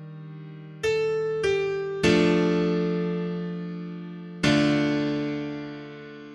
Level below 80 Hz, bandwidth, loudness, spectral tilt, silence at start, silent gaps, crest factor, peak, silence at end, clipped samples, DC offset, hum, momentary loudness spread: -54 dBFS; 11.5 kHz; -25 LUFS; -6 dB/octave; 0 s; none; 18 dB; -8 dBFS; 0 s; under 0.1%; under 0.1%; none; 20 LU